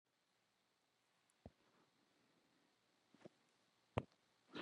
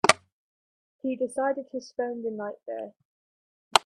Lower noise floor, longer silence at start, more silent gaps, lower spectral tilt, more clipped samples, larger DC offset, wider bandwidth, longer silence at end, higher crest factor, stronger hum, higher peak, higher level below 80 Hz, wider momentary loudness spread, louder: second, -84 dBFS vs under -90 dBFS; first, 1.45 s vs 0.05 s; second, none vs 0.32-0.99 s, 3.05-3.71 s; first, -6.5 dB/octave vs -2 dB/octave; neither; neither; second, 10 kHz vs 13.5 kHz; about the same, 0 s vs 0.05 s; first, 38 dB vs 30 dB; neither; second, -22 dBFS vs 0 dBFS; about the same, -78 dBFS vs -74 dBFS; first, 18 LU vs 12 LU; second, -52 LUFS vs -30 LUFS